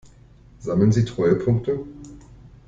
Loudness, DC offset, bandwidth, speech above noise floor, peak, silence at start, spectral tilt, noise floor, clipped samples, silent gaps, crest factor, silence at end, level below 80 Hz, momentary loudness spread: -21 LUFS; under 0.1%; 7.8 kHz; 29 dB; -6 dBFS; 0.6 s; -8.5 dB/octave; -49 dBFS; under 0.1%; none; 18 dB; 0.2 s; -48 dBFS; 21 LU